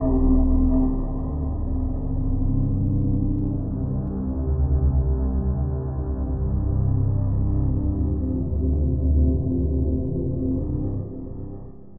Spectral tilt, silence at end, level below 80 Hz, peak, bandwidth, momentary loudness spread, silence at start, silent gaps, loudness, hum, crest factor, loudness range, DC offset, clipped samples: -16 dB/octave; 0 s; -24 dBFS; -8 dBFS; 1.8 kHz; 7 LU; 0 s; none; -24 LUFS; none; 14 dB; 2 LU; under 0.1%; under 0.1%